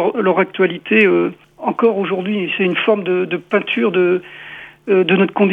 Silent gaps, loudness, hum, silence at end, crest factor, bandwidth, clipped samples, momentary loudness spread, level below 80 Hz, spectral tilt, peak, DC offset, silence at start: none; -16 LUFS; none; 0 s; 16 dB; 4.3 kHz; under 0.1%; 10 LU; -64 dBFS; -8 dB/octave; 0 dBFS; under 0.1%; 0 s